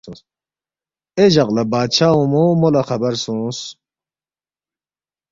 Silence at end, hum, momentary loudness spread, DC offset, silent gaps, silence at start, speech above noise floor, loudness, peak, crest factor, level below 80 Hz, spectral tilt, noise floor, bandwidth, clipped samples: 1.6 s; none; 12 LU; under 0.1%; none; 0.05 s; over 74 dB; -16 LUFS; -2 dBFS; 18 dB; -54 dBFS; -6 dB/octave; under -90 dBFS; 7.8 kHz; under 0.1%